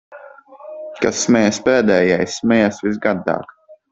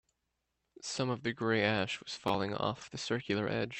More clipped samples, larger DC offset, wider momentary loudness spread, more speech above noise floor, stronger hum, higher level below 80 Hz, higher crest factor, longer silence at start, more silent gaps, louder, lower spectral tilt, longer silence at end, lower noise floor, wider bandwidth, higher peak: neither; neither; first, 12 LU vs 8 LU; second, 24 dB vs 49 dB; neither; first, -54 dBFS vs -68 dBFS; about the same, 16 dB vs 20 dB; second, 0.1 s vs 0.8 s; neither; first, -17 LUFS vs -34 LUFS; about the same, -4.5 dB/octave vs -4.5 dB/octave; first, 0.15 s vs 0 s; second, -40 dBFS vs -84 dBFS; second, 8 kHz vs 15.5 kHz; first, -2 dBFS vs -16 dBFS